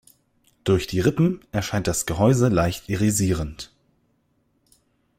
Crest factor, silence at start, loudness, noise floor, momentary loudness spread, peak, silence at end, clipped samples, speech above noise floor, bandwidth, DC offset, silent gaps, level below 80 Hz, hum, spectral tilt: 18 dB; 0.65 s; -22 LUFS; -67 dBFS; 11 LU; -6 dBFS; 1.55 s; under 0.1%; 46 dB; 16.5 kHz; under 0.1%; none; -44 dBFS; none; -5.5 dB/octave